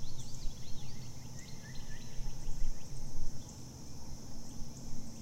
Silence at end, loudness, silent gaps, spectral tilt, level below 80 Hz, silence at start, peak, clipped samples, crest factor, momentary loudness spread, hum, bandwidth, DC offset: 0 s; -47 LUFS; none; -4.5 dB/octave; -40 dBFS; 0 s; -18 dBFS; under 0.1%; 14 dB; 4 LU; none; 8.8 kHz; under 0.1%